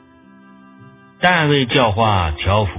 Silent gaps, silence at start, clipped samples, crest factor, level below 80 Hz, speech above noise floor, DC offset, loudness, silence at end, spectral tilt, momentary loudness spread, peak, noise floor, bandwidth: none; 0.8 s; under 0.1%; 18 dB; -32 dBFS; 31 dB; under 0.1%; -15 LUFS; 0 s; -9.5 dB/octave; 4 LU; 0 dBFS; -46 dBFS; 4 kHz